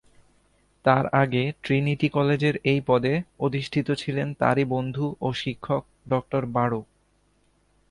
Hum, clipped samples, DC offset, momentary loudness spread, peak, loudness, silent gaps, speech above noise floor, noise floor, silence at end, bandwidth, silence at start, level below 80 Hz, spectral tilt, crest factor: 50 Hz at -50 dBFS; under 0.1%; under 0.1%; 7 LU; -4 dBFS; -25 LUFS; none; 41 dB; -65 dBFS; 1.1 s; 11 kHz; 0.85 s; -56 dBFS; -7.5 dB/octave; 20 dB